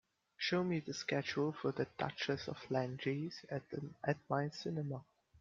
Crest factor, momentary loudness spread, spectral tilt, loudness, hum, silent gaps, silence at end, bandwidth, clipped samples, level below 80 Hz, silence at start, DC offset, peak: 20 dB; 7 LU; -5.5 dB/octave; -40 LUFS; none; none; 0 s; 7.6 kHz; under 0.1%; -76 dBFS; 0.4 s; under 0.1%; -20 dBFS